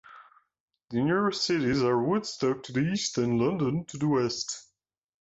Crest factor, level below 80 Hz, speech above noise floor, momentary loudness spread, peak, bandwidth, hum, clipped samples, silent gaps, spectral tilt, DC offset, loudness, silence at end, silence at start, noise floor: 14 dB; -60 dBFS; 46 dB; 5 LU; -14 dBFS; 8 kHz; none; under 0.1%; 0.60-0.68 s; -5 dB/octave; under 0.1%; -28 LUFS; 0.6 s; 0.1 s; -73 dBFS